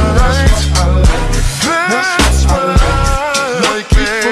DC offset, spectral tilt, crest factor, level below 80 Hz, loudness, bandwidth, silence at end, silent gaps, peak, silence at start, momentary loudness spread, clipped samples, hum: under 0.1%; -4.5 dB/octave; 10 dB; -14 dBFS; -12 LUFS; 13 kHz; 0 s; none; 0 dBFS; 0 s; 3 LU; under 0.1%; none